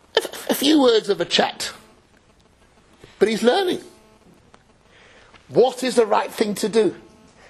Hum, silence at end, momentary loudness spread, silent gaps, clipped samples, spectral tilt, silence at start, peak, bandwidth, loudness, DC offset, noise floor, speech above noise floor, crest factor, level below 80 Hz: none; 0.5 s; 9 LU; none; under 0.1%; -3.5 dB/octave; 0.15 s; -2 dBFS; 13.5 kHz; -20 LUFS; under 0.1%; -55 dBFS; 36 dB; 20 dB; -60 dBFS